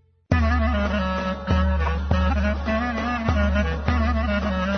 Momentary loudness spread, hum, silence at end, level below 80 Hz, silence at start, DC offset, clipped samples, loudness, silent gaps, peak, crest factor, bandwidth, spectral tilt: 3 LU; none; 0 s; -26 dBFS; 0.3 s; under 0.1%; under 0.1%; -23 LUFS; none; -4 dBFS; 18 dB; 6.4 kHz; -7.5 dB/octave